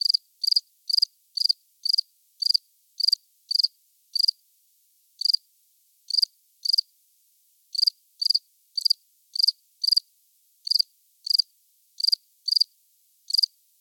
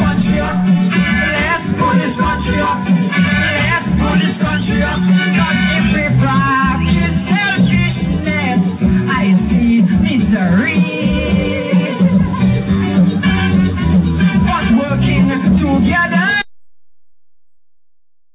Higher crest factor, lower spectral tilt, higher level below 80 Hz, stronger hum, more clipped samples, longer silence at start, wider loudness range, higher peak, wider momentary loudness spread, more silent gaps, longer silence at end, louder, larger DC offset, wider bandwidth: first, 20 dB vs 12 dB; second, 11 dB/octave vs -11 dB/octave; second, under -90 dBFS vs -28 dBFS; neither; neither; about the same, 0.05 s vs 0 s; about the same, 2 LU vs 1 LU; second, -8 dBFS vs -2 dBFS; about the same, 5 LU vs 3 LU; neither; second, 0.35 s vs 1 s; second, -23 LUFS vs -13 LUFS; neither; first, 18 kHz vs 4 kHz